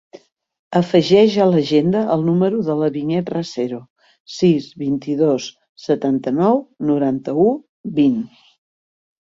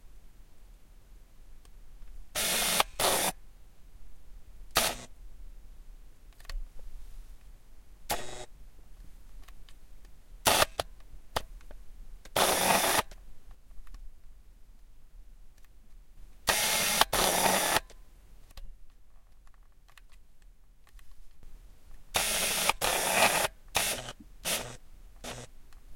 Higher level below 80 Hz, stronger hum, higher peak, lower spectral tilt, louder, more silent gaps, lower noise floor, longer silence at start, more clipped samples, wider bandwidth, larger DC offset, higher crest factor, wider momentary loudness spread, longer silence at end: second, -60 dBFS vs -48 dBFS; neither; about the same, -2 dBFS vs -4 dBFS; first, -7 dB/octave vs -1 dB/octave; first, -18 LUFS vs -28 LUFS; first, 3.90-3.96 s, 4.20-4.25 s, 5.69-5.75 s, 7.69-7.84 s vs none; first, under -90 dBFS vs -54 dBFS; first, 0.7 s vs 0.05 s; neither; second, 7.6 kHz vs 16.5 kHz; neither; second, 16 dB vs 30 dB; second, 11 LU vs 22 LU; first, 1 s vs 0 s